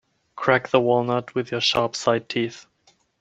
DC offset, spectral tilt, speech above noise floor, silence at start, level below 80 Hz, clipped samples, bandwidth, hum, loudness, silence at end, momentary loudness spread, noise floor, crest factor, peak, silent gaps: under 0.1%; -4.5 dB/octave; 40 dB; 0.35 s; -62 dBFS; under 0.1%; 8.8 kHz; none; -22 LUFS; 0.6 s; 8 LU; -62 dBFS; 22 dB; -2 dBFS; none